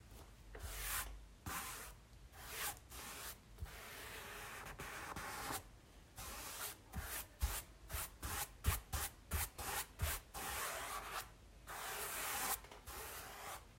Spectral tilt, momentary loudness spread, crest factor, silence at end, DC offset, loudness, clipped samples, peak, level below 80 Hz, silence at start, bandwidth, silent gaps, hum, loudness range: -2 dB/octave; 12 LU; 24 dB; 0 s; under 0.1%; -46 LUFS; under 0.1%; -24 dBFS; -54 dBFS; 0 s; 16 kHz; none; none; 6 LU